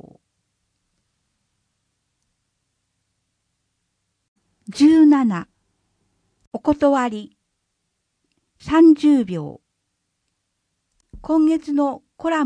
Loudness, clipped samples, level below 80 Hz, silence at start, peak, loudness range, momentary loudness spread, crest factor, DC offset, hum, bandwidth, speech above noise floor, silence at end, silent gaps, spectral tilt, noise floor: -17 LUFS; under 0.1%; -54 dBFS; 4.7 s; -4 dBFS; 5 LU; 21 LU; 16 dB; under 0.1%; none; 10 kHz; 57 dB; 0 s; 6.47-6.51 s; -6.5 dB/octave; -75 dBFS